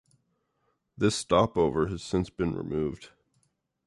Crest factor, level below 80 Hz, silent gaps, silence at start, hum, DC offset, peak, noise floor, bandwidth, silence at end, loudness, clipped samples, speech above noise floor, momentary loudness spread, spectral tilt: 20 dB; -50 dBFS; none; 1 s; none; under 0.1%; -10 dBFS; -75 dBFS; 11.5 kHz; 0.8 s; -28 LUFS; under 0.1%; 48 dB; 8 LU; -5.5 dB/octave